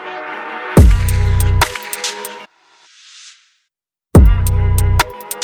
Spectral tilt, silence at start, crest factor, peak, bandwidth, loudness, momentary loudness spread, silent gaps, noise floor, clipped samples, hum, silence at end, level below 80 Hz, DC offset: -5.5 dB/octave; 0 s; 14 dB; 0 dBFS; 19 kHz; -15 LUFS; 15 LU; none; -76 dBFS; under 0.1%; none; 0 s; -18 dBFS; under 0.1%